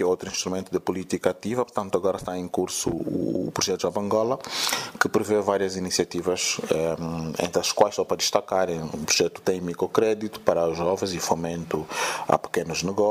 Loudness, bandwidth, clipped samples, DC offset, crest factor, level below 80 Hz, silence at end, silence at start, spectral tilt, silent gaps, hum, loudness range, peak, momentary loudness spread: -25 LUFS; 16 kHz; under 0.1%; under 0.1%; 22 dB; -56 dBFS; 0 s; 0 s; -3.5 dB/octave; none; none; 3 LU; -4 dBFS; 6 LU